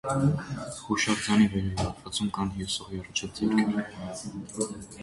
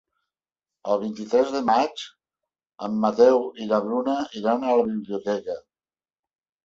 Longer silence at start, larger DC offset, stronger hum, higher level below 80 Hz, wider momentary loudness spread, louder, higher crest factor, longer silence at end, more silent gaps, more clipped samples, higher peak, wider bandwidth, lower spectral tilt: second, 0.05 s vs 0.85 s; neither; neither; first, -48 dBFS vs -66 dBFS; second, 13 LU vs 17 LU; second, -29 LUFS vs -23 LUFS; about the same, 18 dB vs 20 dB; second, 0 s vs 1.05 s; neither; neither; second, -10 dBFS vs -6 dBFS; first, 11.5 kHz vs 7.6 kHz; second, -4.5 dB/octave vs -6 dB/octave